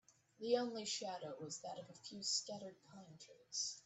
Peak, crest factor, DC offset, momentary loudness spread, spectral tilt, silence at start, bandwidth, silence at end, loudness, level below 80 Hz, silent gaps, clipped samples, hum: -24 dBFS; 22 dB; under 0.1%; 20 LU; -2 dB/octave; 0.1 s; 8.6 kHz; 0.05 s; -44 LUFS; -88 dBFS; none; under 0.1%; none